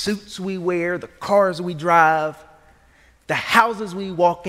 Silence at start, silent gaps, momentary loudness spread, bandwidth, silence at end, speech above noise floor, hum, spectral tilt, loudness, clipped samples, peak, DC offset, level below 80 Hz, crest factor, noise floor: 0 s; none; 13 LU; 16 kHz; 0 s; 34 dB; none; -5 dB/octave; -20 LUFS; under 0.1%; 0 dBFS; under 0.1%; -56 dBFS; 20 dB; -54 dBFS